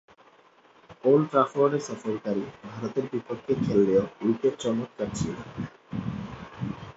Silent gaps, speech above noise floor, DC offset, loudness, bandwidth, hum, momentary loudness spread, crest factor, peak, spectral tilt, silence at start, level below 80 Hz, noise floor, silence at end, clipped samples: none; 32 dB; under 0.1%; -27 LUFS; 8 kHz; none; 14 LU; 20 dB; -8 dBFS; -7 dB/octave; 0.9 s; -56 dBFS; -58 dBFS; 0.05 s; under 0.1%